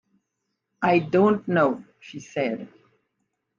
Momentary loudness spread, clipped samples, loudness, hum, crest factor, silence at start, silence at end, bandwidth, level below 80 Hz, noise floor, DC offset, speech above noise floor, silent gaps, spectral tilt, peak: 15 LU; under 0.1%; -23 LUFS; none; 18 dB; 0.8 s; 0.9 s; 7.4 kHz; -68 dBFS; -79 dBFS; under 0.1%; 57 dB; none; -7.5 dB/octave; -8 dBFS